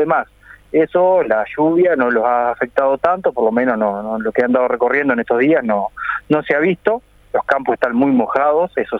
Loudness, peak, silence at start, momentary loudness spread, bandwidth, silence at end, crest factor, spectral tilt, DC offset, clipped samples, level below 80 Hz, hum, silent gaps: -16 LUFS; -2 dBFS; 0 s; 6 LU; 5.6 kHz; 0 s; 14 dB; -8 dB/octave; under 0.1%; under 0.1%; -52 dBFS; 50 Hz at -50 dBFS; none